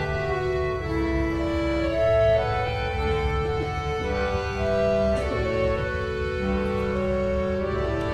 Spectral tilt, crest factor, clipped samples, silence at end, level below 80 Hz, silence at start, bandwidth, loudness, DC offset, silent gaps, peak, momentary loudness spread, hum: -7 dB/octave; 14 dB; under 0.1%; 0 s; -34 dBFS; 0 s; 11 kHz; -25 LUFS; under 0.1%; none; -10 dBFS; 5 LU; none